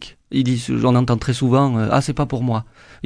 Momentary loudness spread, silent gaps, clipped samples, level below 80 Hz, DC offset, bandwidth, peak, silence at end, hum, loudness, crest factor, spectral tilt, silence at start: 6 LU; none; under 0.1%; -42 dBFS; under 0.1%; 10.5 kHz; -2 dBFS; 0 s; none; -19 LUFS; 16 dB; -7 dB/octave; 0 s